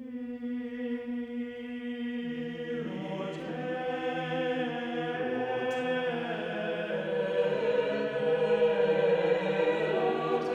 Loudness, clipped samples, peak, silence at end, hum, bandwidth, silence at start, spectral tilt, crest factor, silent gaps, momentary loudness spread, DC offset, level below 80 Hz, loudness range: -31 LUFS; under 0.1%; -14 dBFS; 0 s; none; 8 kHz; 0 s; -6.5 dB/octave; 16 dB; none; 10 LU; under 0.1%; -72 dBFS; 8 LU